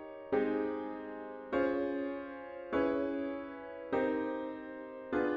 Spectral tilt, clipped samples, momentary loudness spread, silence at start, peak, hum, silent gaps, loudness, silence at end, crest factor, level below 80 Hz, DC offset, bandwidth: -8 dB/octave; under 0.1%; 12 LU; 0 s; -20 dBFS; none; none; -37 LUFS; 0 s; 16 dB; -66 dBFS; under 0.1%; 5.6 kHz